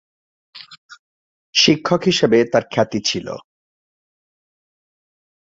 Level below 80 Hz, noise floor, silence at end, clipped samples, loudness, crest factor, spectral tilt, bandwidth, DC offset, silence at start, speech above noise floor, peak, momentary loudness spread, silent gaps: -58 dBFS; under -90 dBFS; 2.1 s; under 0.1%; -17 LUFS; 20 dB; -4 dB/octave; 7.8 kHz; under 0.1%; 0.55 s; over 73 dB; -2 dBFS; 11 LU; 0.78-0.89 s, 0.99-1.53 s